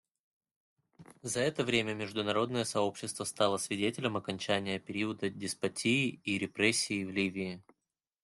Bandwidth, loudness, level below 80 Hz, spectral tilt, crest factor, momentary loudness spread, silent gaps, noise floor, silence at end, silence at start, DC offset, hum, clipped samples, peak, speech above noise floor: 12.5 kHz; -33 LUFS; -72 dBFS; -3.5 dB/octave; 22 dB; 7 LU; none; -89 dBFS; 0.6 s; 1 s; under 0.1%; none; under 0.1%; -12 dBFS; 56 dB